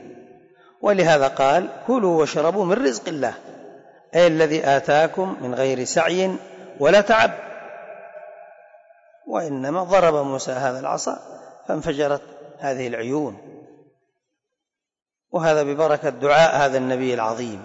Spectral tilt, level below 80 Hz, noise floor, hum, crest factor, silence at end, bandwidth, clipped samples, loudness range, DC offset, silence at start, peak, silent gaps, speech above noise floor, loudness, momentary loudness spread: -4.5 dB/octave; -58 dBFS; -84 dBFS; none; 14 dB; 0 s; 8 kHz; under 0.1%; 8 LU; under 0.1%; 0 s; -6 dBFS; none; 65 dB; -20 LUFS; 16 LU